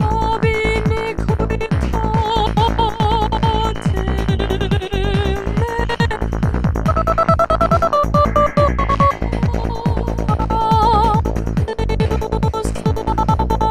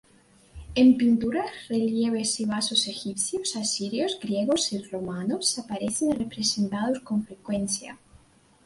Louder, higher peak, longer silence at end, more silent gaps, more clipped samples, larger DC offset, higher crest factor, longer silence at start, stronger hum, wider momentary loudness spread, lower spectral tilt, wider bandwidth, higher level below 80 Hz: first, -17 LUFS vs -26 LUFS; first, 0 dBFS vs -8 dBFS; second, 0 s vs 0.7 s; neither; neither; neither; about the same, 16 dB vs 18 dB; second, 0 s vs 0.55 s; neither; second, 6 LU vs 9 LU; first, -7 dB/octave vs -3.5 dB/octave; first, 14 kHz vs 11.5 kHz; first, -22 dBFS vs -56 dBFS